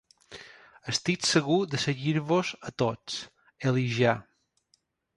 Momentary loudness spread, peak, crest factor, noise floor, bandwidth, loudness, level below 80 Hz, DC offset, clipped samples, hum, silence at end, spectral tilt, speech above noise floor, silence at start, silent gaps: 21 LU; -10 dBFS; 20 dB; -71 dBFS; 11.5 kHz; -28 LUFS; -64 dBFS; under 0.1%; under 0.1%; none; 0.95 s; -4.5 dB/octave; 44 dB; 0.3 s; none